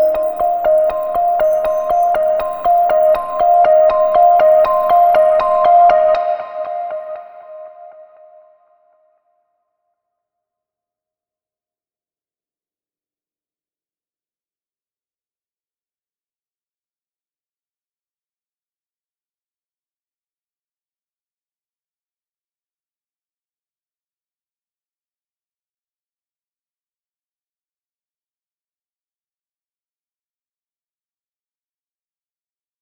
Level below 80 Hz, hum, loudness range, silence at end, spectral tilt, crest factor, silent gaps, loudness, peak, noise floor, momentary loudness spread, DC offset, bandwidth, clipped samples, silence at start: -52 dBFS; none; 16 LU; 24.8 s; -5 dB/octave; 18 dB; none; -13 LUFS; -2 dBFS; under -90 dBFS; 13 LU; under 0.1%; over 20 kHz; under 0.1%; 0 s